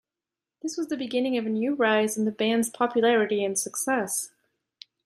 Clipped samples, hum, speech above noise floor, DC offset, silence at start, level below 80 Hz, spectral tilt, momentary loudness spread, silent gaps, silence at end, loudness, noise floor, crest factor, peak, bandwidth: under 0.1%; none; 64 dB; under 0.1%; 0.65 s; -76 dBFS; -3 dB/octave; 9 LU; none; 0.8 s; -25 LUFS; -90 dBFS; 18 dB; -10 dBFS; 15.5 kHz